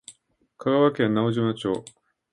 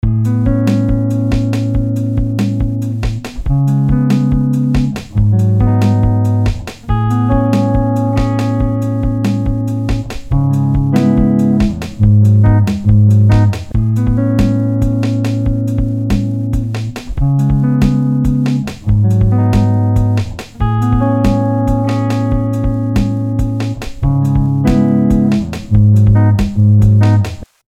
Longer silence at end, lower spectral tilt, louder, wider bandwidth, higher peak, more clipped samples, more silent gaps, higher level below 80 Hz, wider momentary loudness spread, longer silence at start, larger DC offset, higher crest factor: first, 0.5 s vs 0.25 s; second, -7 dB/octave vs -8.5 dB/octave; second, -24 LUFS vs -13 LUFS; first, 11.5 kHz vs 8.6 kHz; second, -6 dBFS vs 0 dBFS; neither; neither; second, -64 dBFS vs -22 dBFS; about the same, 9 LU vs 8 LU; about the same, 0.1 s vs 0.05 s; neither; first, 18 dB vs 12 dB